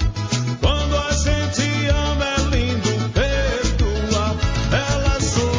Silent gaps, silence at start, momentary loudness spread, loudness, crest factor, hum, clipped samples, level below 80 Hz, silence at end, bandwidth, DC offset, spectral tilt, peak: none; 0 s; 2 LU; -20 LUFS; 14 dB; none; under 0.1%; -24 dBFS; 0 s; 7.6 kHz; under 0.1%; -4.5 dB/octave; -6 dBFS